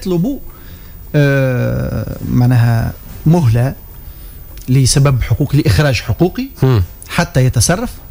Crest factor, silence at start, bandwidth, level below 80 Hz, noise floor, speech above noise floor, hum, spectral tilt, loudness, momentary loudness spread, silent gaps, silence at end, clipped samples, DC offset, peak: 12 dB; 0 s; 16 kHz; -30 dBFS; -32 dBFS; 20 dB; none; -6 dB/octave; -14 LUFS; 22 LU; none; 0 s; under 0.1%; under 0.1%; -2 dBFS